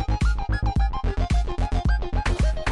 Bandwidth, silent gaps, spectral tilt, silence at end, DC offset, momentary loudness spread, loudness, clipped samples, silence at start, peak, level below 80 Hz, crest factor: 10.5 kHz; none; -6.5 dB/octave; 0 s; under 0.1%; 2 LU; -25 LUFS; under 0.1%; 0 s; -12 dBFS; -24 dBFS; 10 dB